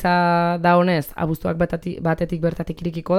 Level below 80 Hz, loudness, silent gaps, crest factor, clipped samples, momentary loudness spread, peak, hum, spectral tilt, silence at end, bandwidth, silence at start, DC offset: -42 dBFS; -21 LUFS; none; 16 dB; under 0.1%; 9 LU; -4 dBFS; none; -7.5 dB/octave; 0 s; 16 kHz; 0 s; under 0.1%